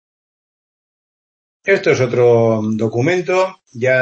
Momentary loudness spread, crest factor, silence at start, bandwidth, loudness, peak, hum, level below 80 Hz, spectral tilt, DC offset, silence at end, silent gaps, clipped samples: 8 LU; 16 dB; 1.65 s; 8 kHz; -15 LUFS; -2 dBFS; none; -60 dBFS; -6.5 dB/octave; under 0.1%; 0 s; none; under 0.1%